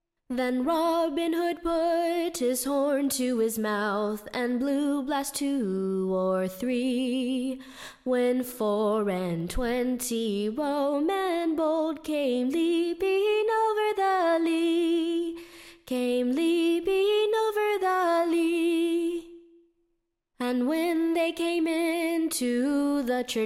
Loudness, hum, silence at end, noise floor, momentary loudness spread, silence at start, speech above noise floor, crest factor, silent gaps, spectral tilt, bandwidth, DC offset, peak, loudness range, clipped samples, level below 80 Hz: -27 LUFS; none; 0 s; -77 dBFS; 6 LU; 0.3 s; 51 dB; 10 dB; none; -4.5 dB/octave; 16.5 kHz; under 0.1%; -16 dBFS; 3 LU; under 0.1%; -52 dBFS